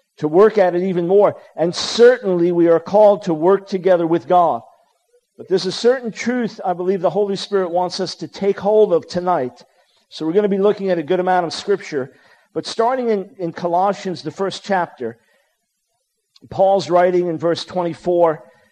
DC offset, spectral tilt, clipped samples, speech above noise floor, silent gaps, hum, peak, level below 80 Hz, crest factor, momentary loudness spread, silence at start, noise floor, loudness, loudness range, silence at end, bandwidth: under 0.1%; -5.5 dB/octave; under 0.1%; 54 dB; none; none; -2 dBFS; -64 dBFS; 16 dB; 12 LU; 0.2 s; -71 dBFS; -17 LUFS; 7 LU; 0.35 s; 9.8 kHz